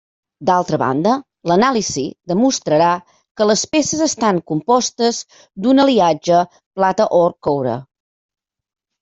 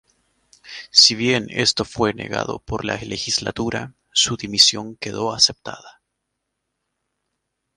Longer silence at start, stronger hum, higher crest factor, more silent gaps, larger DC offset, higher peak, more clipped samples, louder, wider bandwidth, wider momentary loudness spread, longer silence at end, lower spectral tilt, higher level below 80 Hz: second, 0.4 s vs 0.65 s; neither; second, 14 dB vs 22 dB; first, 3.31-3.35 s, 6.66-6.71 s vs none; neither; about the same, -2 dBFS vs 0 dBFS; neither; about the same, -16 LUFS vs -18 LUFS; second, 8.2 kHz vs 16 kHz; second, 9 LU vs 17 LU; second, 1.2 s vs 1.85 s; first, -4.5 dB/octave vs -2 dB/octave; second, -56 dBFS vs -50 dBFS